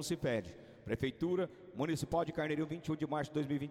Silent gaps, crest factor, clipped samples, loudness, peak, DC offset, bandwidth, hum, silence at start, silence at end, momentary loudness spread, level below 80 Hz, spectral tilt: none; 14 dB; under 0.1%; -38 LUFS; -22 dBFS; under 0.1%; 16 kHz; none; 0 s; 0 s; 6 LU; -62 dBFS; -6 dB/octave